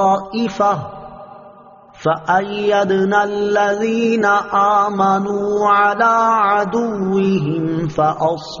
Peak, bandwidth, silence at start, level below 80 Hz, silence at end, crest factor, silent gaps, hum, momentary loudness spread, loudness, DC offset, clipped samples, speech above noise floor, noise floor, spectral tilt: -2 dBFS; 7.2 kHz; 0 s; -52 dBFS; 0 s; 14 dB; none; none; 7 LU; -16 LUFS; under 0.1%; under 0.1%; 27 dB; -42 dBFS; -4.5 dB/octave